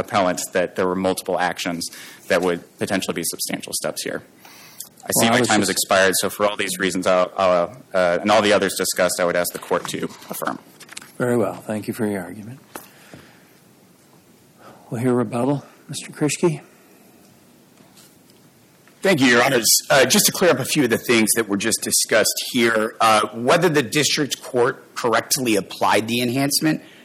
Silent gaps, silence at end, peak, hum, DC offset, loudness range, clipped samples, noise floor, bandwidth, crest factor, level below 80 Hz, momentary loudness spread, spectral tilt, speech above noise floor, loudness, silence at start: none; 0.2 s; -4 dBFS; none; under 0.1%; 11 LU; under 0.1%; -52 dBFS; 17 kHz; 18 dB; -62 dBFS; 14 LU; -3 dB/octave; 32 dB; -19 LUFS; 0 s